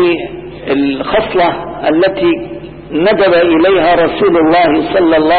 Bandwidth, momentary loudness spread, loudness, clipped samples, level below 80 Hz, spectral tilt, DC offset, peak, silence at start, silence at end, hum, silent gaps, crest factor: 4.7 kHz; 10 LU; -11 LUFS; under 0.1%; -40 dBFS; -11.5 dB/octave; under 0.1%; -2 dBFS; 0 s; 0 s; none; none; 8 dB